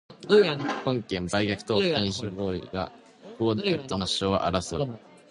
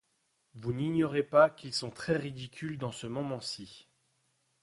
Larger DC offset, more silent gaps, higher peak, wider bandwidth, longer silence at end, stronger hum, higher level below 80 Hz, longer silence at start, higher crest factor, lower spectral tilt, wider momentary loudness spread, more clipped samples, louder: neither; neither; first, -6 dBFS vs -10 dBFS; about the same, 11 kHz vs 11.5 kHz; second, 0.35 s vs 0.8 s; neither; first, -50 dBFS vs -66 dBFS; second, 0.1 s vs 0.55 s; about the same, 20 dB vs 24 dB; about the same, -5 dB/octave vs -5.5 dB/octave; second, 11 LU vs 16 LU; neither; first, -27 LUFS vs -32 LUFS